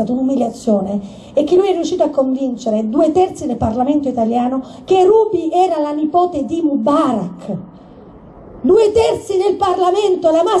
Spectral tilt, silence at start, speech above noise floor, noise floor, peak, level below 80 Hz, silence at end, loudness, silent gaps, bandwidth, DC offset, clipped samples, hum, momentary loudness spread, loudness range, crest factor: -6.5 dB/octave; 0 s; 24 dB; -39 dBFS; -2 dBFS; -46 dBFS; 0 s; -15 LUFS; none; 11.5 kHz; under 0.1%; under 0.1%; none; 8 LU; 2 LU; 12 dB